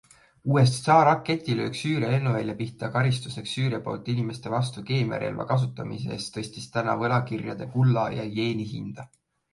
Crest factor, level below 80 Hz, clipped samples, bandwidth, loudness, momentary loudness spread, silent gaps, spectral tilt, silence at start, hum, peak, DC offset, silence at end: 20 dB; -60 dBFS; under 0.1%; 11.5 kHz; -26 LUFS; 11 LU; none; -6.5 dB/octave; 0.45 s; none; -6 dBFS; under 0.1%; 0.45 s